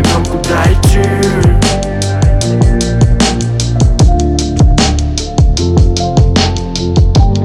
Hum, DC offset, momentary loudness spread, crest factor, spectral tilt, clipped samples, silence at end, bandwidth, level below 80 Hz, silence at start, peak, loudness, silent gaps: none; under 0.1%; 4 LU; 8 dB; -5.5 dB/octave; under 0.1%; 0 s; 13.5 kHz; -14 dBFS; 0 s; 0 dBFS; -11 LUFS; none